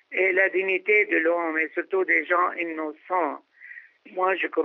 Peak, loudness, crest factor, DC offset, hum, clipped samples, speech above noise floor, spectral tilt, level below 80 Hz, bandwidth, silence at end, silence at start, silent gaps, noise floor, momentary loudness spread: -8 dBFS; -23 LUFS; 18 dB; under 0.1%; none; under 0.1%; 22 dB; -5.5 dB/octave; under -90 dBFS; 6 kHz; 0 s; 0.1 s; none; -46 dBFS; 17 LU